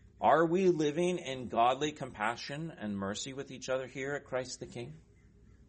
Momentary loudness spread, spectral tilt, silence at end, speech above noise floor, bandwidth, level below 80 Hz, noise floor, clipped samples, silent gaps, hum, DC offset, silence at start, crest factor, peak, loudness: 14 LU; -5 dB/octave; 0.7 s; 27 dB; 8.4 kHz; -64 dBFS; -60 dBFS; under 0.1%; none; none; under 0.1%; 0.2 s; 20 dB; -12 dBFS; -33 LUFS